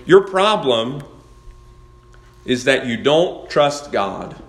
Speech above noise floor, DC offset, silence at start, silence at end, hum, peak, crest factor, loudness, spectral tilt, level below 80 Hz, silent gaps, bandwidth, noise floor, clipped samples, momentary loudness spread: 28 dB; under 0.1%; 0 s; 0.05 s; none; 0 dBFS; 18 dB; -17 LUFS; -4.5 dB/octave; -48 dBFS; none; 12 kHz; -45 dBFS; under 0.1%; 11 LU